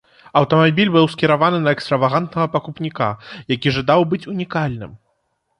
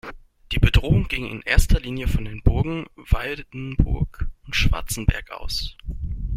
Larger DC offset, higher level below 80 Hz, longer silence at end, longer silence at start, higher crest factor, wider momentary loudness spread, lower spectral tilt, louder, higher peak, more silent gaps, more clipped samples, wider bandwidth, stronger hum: neither; second, -52 dBFS vs -24 dBFS; first, 0.65 s vs 0 s; first, 0.35 s vs 0.05 s; about the same, 16 dB vs 20 dB; about the same, 10 LU vs 12 LU; first, -7.5 dB/octave vs -5 dB/octave; first, -18 LUFS vs -24 LUFS; about the same, -2 dBFS vs -2 dBFS; neither; neither; second, 11 kHz vs 16 kHz; neither